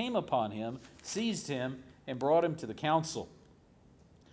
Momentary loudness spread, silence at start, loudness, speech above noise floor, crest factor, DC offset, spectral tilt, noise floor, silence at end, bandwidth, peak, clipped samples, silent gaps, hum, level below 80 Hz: 14 LU; 0 s; -34 LUFS; 28 dB; 18 dB; under 0.1%; -5 dB/octave; -61 dBFS; 1 s; 8 kHz; -16 dBFS; under 0.1%; none; none; -66 dBFS